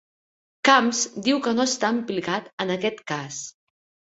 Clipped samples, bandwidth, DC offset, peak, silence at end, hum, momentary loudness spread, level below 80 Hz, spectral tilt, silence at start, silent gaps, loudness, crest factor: under 0.1%; 8 kHz; under 0.1%; 0 dBFS; 0.65 s; none; 13 LU; -68 dBFS; -3 dB/octave; 0.65 s; 2.53-2.58 s; -23 LUFS; 24 dB